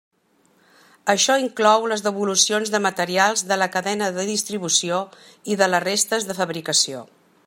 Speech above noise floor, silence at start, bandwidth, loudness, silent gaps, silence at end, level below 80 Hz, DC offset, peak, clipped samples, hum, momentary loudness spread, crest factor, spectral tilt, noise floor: 40 dB; 1.05 s; 16.5 kHz; -20 LUFS; none; 0.45 s; -72 dBFS; under 0.1%; -2 dBFS; under 0.1%; none; 8 LU; 20 dB; -2 dB/octave; -61 dBFS